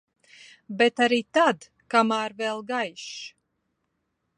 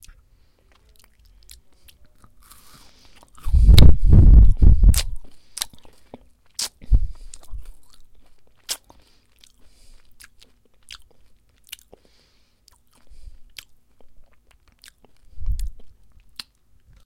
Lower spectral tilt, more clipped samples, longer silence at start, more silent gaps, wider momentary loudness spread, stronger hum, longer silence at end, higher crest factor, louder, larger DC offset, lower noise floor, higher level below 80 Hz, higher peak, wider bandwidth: second, -3.5 dB/octave vs -5.5 dB/octave; neither; second, 0.7 s vs 3.45 s; neither; second, 16 LU vs 29 LU; neither; about the same, 1.1 s vs 1.15 s; about the same, 20 dB vs 18 dB; second, -24 LUFS vs -18 LUFS; neither; first, -77 dBFS vs -59 dBFS; second, -74 dBFS vs -22 dBFS; second, -6 dBFS vs 0 dBFS; second, 10.5 kHz vs 16 kHz